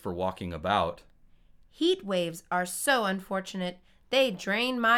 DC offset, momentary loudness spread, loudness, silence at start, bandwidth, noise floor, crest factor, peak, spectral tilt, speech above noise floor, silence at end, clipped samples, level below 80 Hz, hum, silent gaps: under 0.1%; 9 LU; -29 LUFS; 0.05 s; 18 kHz; -57 dBFS; 18 dB; -12 dBFS; -3.5 dB/octave; 29 dB; 0 s; under 0.1%; -58 dBFS; none; none